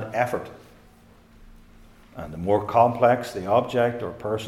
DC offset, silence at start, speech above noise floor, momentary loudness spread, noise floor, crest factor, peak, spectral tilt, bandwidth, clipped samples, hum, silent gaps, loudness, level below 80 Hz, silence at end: under 0.1%; 0 s; 30 dB; 19 LU; -52 dBFS; 20 dB; -4 dBFS; -6.5 dB/octave; 15.5 kHz; under 0.1%; none; none; -23 LUFS; -54 dBFS; 0 s